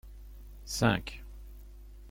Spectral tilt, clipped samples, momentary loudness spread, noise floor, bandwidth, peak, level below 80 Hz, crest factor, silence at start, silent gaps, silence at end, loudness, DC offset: -5 dB/octave; under 0.1%; 24 LU; -49 dBFS; 17 kHz; -10 dBFS; -46 dBFS; 24 dB; 0.05 s; none; 0 s; -31 LUFS; under 0.1%